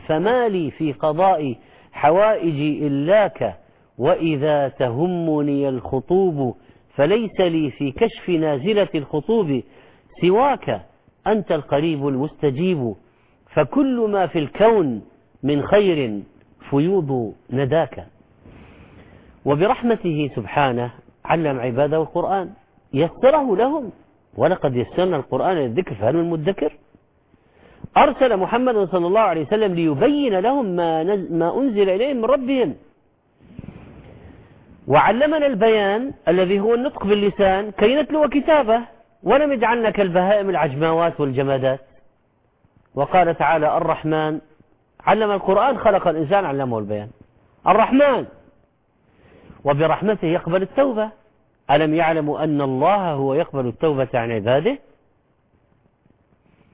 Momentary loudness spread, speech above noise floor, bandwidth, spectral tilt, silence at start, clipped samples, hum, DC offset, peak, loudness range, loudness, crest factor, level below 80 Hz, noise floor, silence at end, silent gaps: 9 LU; 44 dB; 4 kHz; -10.5 dB/octave; 0.05 s; under 0.1%; none; under 0.1%; -2 dBFS; 4 LU; -19 LUFS; 18 dB; -50 dBFS; -62 dBFS; 1.95 s; none